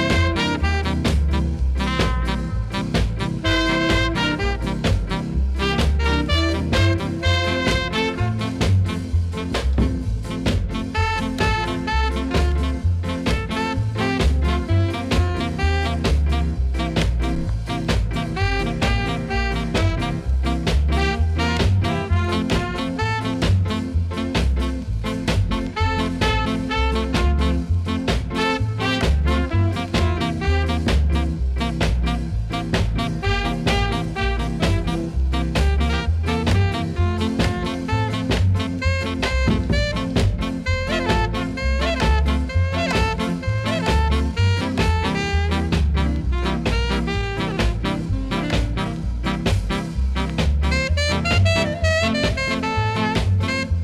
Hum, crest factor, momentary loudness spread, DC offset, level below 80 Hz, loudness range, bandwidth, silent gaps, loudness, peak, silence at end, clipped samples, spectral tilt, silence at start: none; 12 dB; 4 LU; under 0.1%; -24 dBFS; 2 LU; 12.5 kHz; none; -21 LUFS; -8 dBFS; 0 s; under 0.1%; -6 dB/octave; 0 s